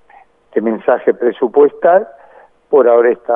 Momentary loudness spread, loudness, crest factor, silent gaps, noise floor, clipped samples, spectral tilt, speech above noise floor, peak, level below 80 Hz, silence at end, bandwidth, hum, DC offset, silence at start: 8 LU; -13 LUFS; 14 dB; none; -46 dBFS; under 0.1%; -9.5 dB/octave; 34 dB; 0 dBFS; -66 dBFS; 0 s; 3.6 kHz; none; under 0.1%; 0.55 s